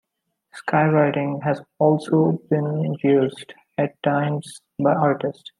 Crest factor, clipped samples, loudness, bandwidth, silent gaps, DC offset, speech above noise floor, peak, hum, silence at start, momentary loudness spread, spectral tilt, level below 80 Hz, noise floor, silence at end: 18 dB; under 0.1%; -21 LUFS; 11.5 kHz; none; under 0.1%; 53 dB; -4 dBFS; none; 0.55 s; 9 LU; -8 dB/octave; -68 dBFS; -74 dBFS; 0.3 s